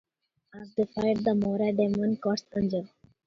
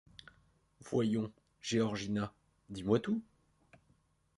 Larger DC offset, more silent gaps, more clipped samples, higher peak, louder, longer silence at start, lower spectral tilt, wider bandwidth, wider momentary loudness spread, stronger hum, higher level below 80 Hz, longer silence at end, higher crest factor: neither; neither; neither; first, -12 dBFS vs -16 dBFS; first, -28 LUFS vs -36 LUFS; second, 0.55 s vs 0.85 s; first, -7.5 dB/octave vs -6 dB/octave; second, 7 kHz vs 11.5 kHz; second, 9 LU vs 14 LU; neither; first, -60 dBFS vs -66 dBFS; second, 0.4 s vs 1.15 s; second, 16 dB vs 22 dB